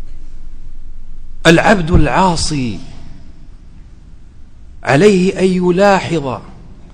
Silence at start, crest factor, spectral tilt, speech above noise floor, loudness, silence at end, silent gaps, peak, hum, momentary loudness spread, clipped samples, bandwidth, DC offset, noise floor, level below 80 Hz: 0 s; 14 dB; -5.5 dB/octave; 24 dB; -12 LUFS; 0.05 s; none; 0 dBFS; none; 14 LU; 0.4%; 10.5 kHz; under 0.1%; -35 dBFS; -24 dBFS